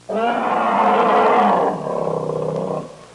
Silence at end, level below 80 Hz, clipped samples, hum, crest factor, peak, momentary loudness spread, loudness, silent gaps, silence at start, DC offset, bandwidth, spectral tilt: 0.1 s; -60 dBFS; under 0.1%; none; 12 dB; -6 dBFS; 9 LU; -18 LUFS; none; 0.1 s; under 0.1%; 11 kHz; -6.5 dB/octave